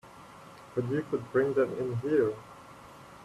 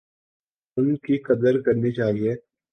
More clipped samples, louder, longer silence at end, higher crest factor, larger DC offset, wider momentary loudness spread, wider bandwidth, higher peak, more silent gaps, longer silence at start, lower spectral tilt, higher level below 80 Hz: neither; second, -30 LUFS vs -23 LUFS; second, 0 s vs 0.35 s; about the same, 18 dB vs 16 dB; neither; first, 22 LU vs 8 LU; first, 13 kHz vs 6.4 kHz; second, -14 dBFS vs -6 dBFS; neither; second, 0.05 s vs 0.75 s; second, -8 dB/octave vs -9.5 dB/octave; second, -66 dBFS vs -60 dBFS